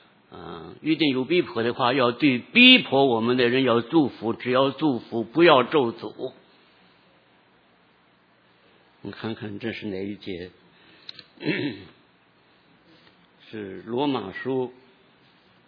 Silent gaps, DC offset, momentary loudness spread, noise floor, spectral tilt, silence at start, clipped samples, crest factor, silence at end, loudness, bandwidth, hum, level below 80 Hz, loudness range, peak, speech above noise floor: none; under 0.1%; 23 LU; -60 dBFS; -7.5 dB/octave; 0.3 s; under 0.1%; 24 dB; 0.95 s; -22 LUFS; 5.2 kHz; none; -70 dBFS; 18 LU; -2 dBFS; 38 dB